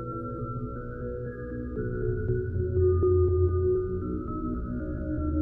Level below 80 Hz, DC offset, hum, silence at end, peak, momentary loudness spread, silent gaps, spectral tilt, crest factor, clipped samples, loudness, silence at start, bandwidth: -38 dBFS; under 0.1%; none; 0 s; -14 dBFS; 12 LU; none; -13.5 dB/octave; 14 dB; under 0.1%; -29 LUFS; 0 s; 1.8 kHz